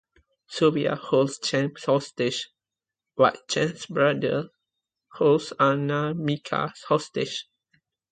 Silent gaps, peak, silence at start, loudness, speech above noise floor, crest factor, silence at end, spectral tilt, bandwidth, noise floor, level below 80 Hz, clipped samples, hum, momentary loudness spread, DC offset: none; -4 dBFS; 0.5 s; -25 LUFS; 65 dB; 20 dB; 0.7 s; -5 dB/octave; 9.4 kHz; -89 dBFS; -68 dBFS; under 0.1%; none; 9 LU; under 0.1%